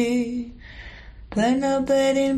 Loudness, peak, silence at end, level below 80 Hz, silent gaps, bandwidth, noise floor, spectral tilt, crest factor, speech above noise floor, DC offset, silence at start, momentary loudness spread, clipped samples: -22 LUFS; -10 dBFS; 0 s; -46 dBFS; none; 12.5 kHz; -41 dBFS; -5 dB/octave; 12 dB; 20 dB; under 0.1%; 0 s; 21 LU; under 0.1%